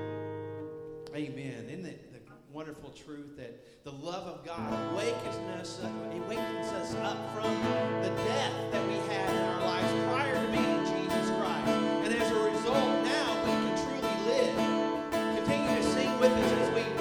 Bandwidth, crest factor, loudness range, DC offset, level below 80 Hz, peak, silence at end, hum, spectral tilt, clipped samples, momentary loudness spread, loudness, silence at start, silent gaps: over 20 kHz; 20 dB; 13 LU; under 0.1%; -60 dBFS; -12 dBFS; 0 s; none; -5 dB/octave; under 0.1%; 16 LU; -31 LUFS; 0 s; none